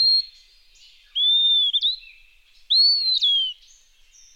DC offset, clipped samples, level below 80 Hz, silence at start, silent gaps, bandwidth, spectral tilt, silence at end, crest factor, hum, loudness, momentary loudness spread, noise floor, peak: under 0.1%; under 0.1%; -60 dBFS; 0 s; none; 9.6 kHz; 4.5 dB/octave; 0.85 s; 12 dB; none; -17 LUFS; 13 LU; -54 dBFS; -10 dBFS